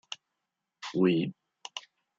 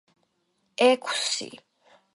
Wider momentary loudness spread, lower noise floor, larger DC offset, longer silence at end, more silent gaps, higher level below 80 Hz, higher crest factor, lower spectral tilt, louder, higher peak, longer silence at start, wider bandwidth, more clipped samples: about the same, 18 LU vs 20 LU; first, -85 dBFS vs -73 dBFS; neither; second, 0.4 s vs 0.6 s; neither; about the same, -78 dBFS vs -82 dBFS; about the same, 20 dB vs 20 dB; first, -6 dB/octave vs -1 dB/octave; second, -29 LUFS vs -24 LUFS; second, -14 dBFS vs -8 dBFS; second, 0.1 s vs 0.8 s; second, 7.8 kHz vs 11.5 kHz; neither